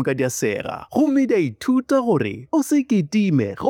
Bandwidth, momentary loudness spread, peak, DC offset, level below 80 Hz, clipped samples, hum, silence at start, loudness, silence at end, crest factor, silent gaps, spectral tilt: 17 kHz; 5 LU; -6 dBFS; under 0.1%; -60 dBFS; under 0.1%; none; 0 s; -20 LUFS; 0 s; 14 dB; none; -6 dB/octave